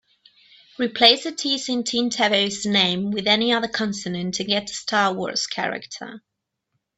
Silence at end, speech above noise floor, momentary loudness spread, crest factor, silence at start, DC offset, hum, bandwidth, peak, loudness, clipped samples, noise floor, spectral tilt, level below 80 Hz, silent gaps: 0.8 s; 54 dB; 12 LU; 24 dB; 0.8 s; under 0.1%; none; 8.4 kHz; 0 dBFS; -21 LUFS; under 0.1%; -76 dBFS; -3 dB/octave; -62 dBFS; none